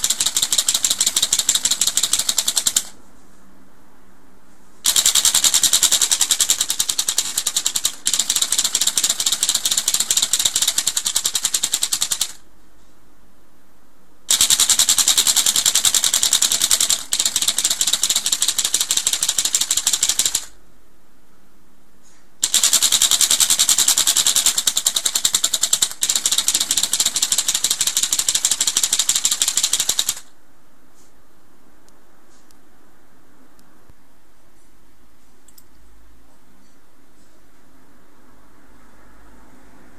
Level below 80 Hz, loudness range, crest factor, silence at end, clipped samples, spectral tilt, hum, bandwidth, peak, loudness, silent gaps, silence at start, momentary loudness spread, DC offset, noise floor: -54 dBFS; 6 LU; 20 dB; 9.8 s; under 0.1%; 2.5 dB/octave; none; 17 kHz; 0 dBFS; -15 LUFS; none; 0 s; 6 LU; 2%; -56 dBFS